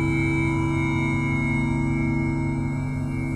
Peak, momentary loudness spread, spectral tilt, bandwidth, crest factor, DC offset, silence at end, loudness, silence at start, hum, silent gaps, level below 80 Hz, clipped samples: -12 dBFS; 5 LU; -7.5 dB/octave; 10 kHz; 12 dB; under 0.1%; 0 s; -24 LUFS; 0 s; none; none; -36 dBFS; under 0.1%